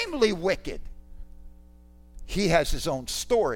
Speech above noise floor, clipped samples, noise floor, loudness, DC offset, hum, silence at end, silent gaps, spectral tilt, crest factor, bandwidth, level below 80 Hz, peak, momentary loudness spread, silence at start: 26 dB; under 0.1%; -51 dBFS; -26 LUFS; under 0.1%; 60 Hz at -50 dBFS; 0 s; none; -4 dB/octave; 20 dB; 16.5 kHz; -38 dBFS; -8 dBFS; 11 LU; 0 s